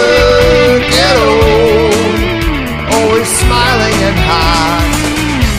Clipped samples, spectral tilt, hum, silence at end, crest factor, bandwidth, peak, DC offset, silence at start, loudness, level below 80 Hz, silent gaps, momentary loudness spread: under 0.1%; -4 dB/octave; none; 0 s; 10 dB; 16 kHz; 0 dBFS; under 0.1%; 0 s; -9 LUFS; -18 dBFS; none; 6 LU